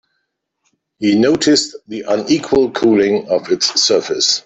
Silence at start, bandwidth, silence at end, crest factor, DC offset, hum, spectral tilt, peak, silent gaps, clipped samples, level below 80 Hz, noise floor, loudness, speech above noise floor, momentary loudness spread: 1 s; 8.4 kHz; 0.05 s; 14 dB; under 0.1%; none; -3 dB/octave; 0 dBFS; none; under 0.1%; -52 dBFS; -71 dBFS; -14 LUFS; 57 dB; 7 LU